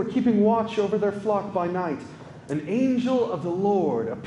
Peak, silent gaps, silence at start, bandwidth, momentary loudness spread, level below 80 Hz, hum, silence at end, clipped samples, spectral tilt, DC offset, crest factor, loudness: -10 dBFS; none; 0 s; 10 kHz; 11 LU; -64 dBFS; none; 0 s; under 0.1%; -7.5 dB/octave; under 0.1%; 14 dB; -24 LUFS